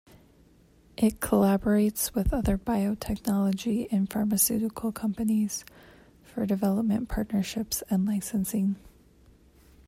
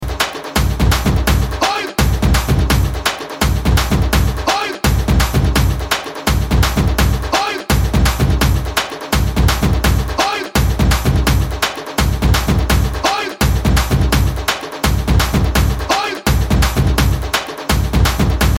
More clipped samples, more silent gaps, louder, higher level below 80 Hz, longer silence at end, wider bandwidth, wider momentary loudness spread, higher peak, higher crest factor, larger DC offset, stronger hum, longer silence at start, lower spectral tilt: neither; neither; second, -27 LUFS vs -16 LUFS; second, -44 dBFS vs -18 dBFS; first, 1 s vs 0 s; about the same, 16 kHz vs 17 kHz; first, 8 LU vs 4 LU; second, -8 dBFS vs 0 dBFS; about the same, 18 dB vs 14 dB; neither; neither; first, 1 s vs 0 s; about the same, -5.5 dB/octave vs -5 dB/octave